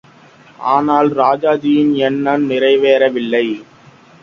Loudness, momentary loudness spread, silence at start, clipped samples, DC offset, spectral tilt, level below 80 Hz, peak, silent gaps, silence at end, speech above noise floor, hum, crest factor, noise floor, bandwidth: -14 LUFS; 5 LU; 0.6 s; under 0.1%; under 0.1%; -7 dB/octave; -60 dBFS; 0 dBFS; none; 0.6 s; 30 dB; none; 14 dB; -44 dBFS; 7 kHz